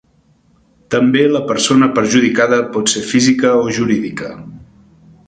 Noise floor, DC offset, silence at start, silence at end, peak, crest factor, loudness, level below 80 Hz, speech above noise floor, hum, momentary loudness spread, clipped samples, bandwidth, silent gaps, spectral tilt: -54 dBFS; under 0.1%; 0.9 s; 0.7 s; 0 dBFS; 14 dB; -13 LUFS; -52 dBFS; 41 dB; none; 9 LU; under 0.1%; 9.4 kHz; none; -4 dB/octave